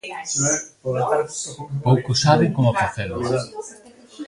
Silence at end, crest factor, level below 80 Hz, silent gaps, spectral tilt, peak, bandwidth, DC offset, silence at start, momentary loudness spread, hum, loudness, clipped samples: 0 s; 20 dB; -50 dBFS; none; -4.5 dB/octave; -2 dBFS; 11.5 kHz; under 0.1%; 0.05 s; 12 LU; none; -21 LUFS; under 0.1%